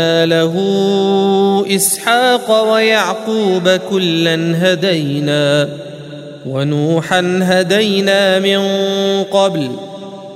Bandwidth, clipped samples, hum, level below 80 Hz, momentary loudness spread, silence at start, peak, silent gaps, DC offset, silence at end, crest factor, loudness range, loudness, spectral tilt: 16 kHz; under 0.1%; none; -62 dBFS; 10 LU; 0 s; 0 dBFS; none; under 0.1%; 0 s; 14 dB; 3 LU; -13 LUFS; -4.5 dB/octave